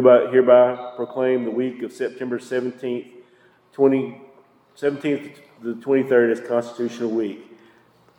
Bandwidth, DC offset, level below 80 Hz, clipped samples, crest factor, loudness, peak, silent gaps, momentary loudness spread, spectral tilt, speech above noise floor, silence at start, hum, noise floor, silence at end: 10.5 kHz; under 0.1%; -78 dBFS; under 0.1%; 20 dB; -21 LUFS; -2 dBFS; none; 16 LU; -7 dB/octave; 36 dB; 0 s; none; -56 dBFS; 0.75 s